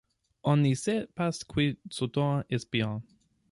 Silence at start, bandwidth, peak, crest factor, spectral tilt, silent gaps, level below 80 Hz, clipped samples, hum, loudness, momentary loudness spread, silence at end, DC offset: 0.45 s; 11.5 kHz; -14 dBFS; 16 dB; -6 dB/octave; none; -60 dBFS; under 0.1%; none; -30 LUFS; 9 LU; 0.5 s; under 0.1%